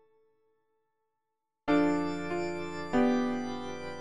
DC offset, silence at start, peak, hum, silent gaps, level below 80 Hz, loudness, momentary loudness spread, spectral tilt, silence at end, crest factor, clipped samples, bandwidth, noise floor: under 0.1%; 0 s; -16 dBFS; none; none; -62 dBFS; -31 LUFS; 11 LU; -6 dB/octave; 0 s; 18 dB; under 0.1%; 11 kHz; -86 dBFS